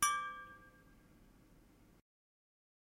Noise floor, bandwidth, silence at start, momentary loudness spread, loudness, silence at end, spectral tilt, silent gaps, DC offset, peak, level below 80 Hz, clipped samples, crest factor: -65 dBFS; 16 kHz; 0 s; 27 LU; -41 LUFS; 2.3 s; 0.5 dB/octave; none; under 0.1%; -20 dBFS; -72 dBFS; under 0.1%; 26 dB